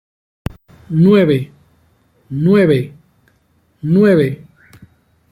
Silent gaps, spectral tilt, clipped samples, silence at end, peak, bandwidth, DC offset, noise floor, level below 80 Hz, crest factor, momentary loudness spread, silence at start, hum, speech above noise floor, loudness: none; -9 dB/octave; under 0.1%; 0.95 s; 0 dBFS; 13 kHz; under 0.1%; -58 dBFS; -46 dBFS; 16 dB; 20 LU; 0.9 s; none; 46 dB; -13 LUFS